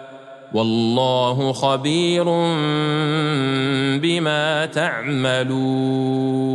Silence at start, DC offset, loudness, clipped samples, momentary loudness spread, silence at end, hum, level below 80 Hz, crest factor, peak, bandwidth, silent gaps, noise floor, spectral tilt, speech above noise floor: 0 s; under 0.1%; -19 LUFS; under 0.1%; 3 LU; 0 s; none; -66 dBFS; 16 dB; -4 dBFS; 11 kHz; none; -39 dBFS; -5.5 dB/octave; 20 dB